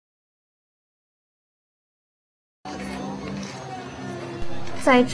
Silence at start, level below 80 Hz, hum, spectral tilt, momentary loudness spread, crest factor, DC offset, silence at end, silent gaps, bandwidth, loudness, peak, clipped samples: 2.6 s; -50 dBFS; none; -5 dB/octave; 15 LU; 24 dB; under 0.1%; 0 s; none; 11 kHz; -28 LUFS; -4 dBFS; under 0.1%